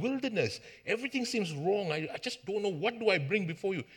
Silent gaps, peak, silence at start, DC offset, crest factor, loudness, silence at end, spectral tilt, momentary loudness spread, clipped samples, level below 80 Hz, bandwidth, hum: none; -14 dBFS; 0 s; under 0.1%; 18 dB; -33 LUFS; 0 s; -5 dB/octave; 6 LU; under 0.1%; -76 dBFS; 17 kHz; none